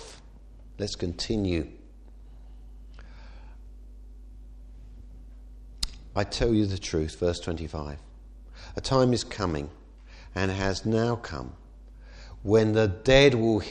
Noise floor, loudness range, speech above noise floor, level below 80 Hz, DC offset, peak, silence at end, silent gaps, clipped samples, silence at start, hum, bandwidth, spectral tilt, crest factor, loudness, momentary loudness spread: -48 dBFS; 22 LU; 23 dB; -42 dBFS; under 0.1%; -4 dBFS; 0 s; none; under 0.1%; 0 s; none; 12 kHz; -5.5 dB/octave; 26 dB; -26 LUFS; 27 LU